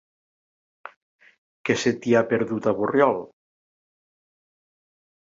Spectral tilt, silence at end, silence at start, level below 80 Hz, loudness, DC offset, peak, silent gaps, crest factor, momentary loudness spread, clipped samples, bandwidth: -5.5 dB/octave; 2.15 s; 0.85 s; -66 dBFS; -22 LUFS; under 0.1%; -4 dBFS; 0.96-1.19 s, 1.38-1.65 s; 22 dB; 7 LU; under 0.1%; 7.8 kHz